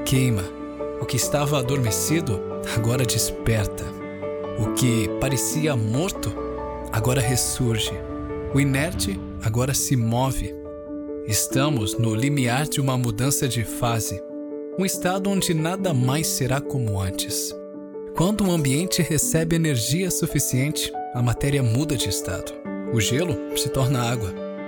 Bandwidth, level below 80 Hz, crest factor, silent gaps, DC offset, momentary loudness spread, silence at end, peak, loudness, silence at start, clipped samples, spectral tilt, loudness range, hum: 18 kHz; -42 dBFS; 14 dB; none; under 0.1%; 10 LU; 0 s; -10 dBFS; -23 LUFS; 0 s; under 0.1%; -4.5 dB/octave; 2 LU; none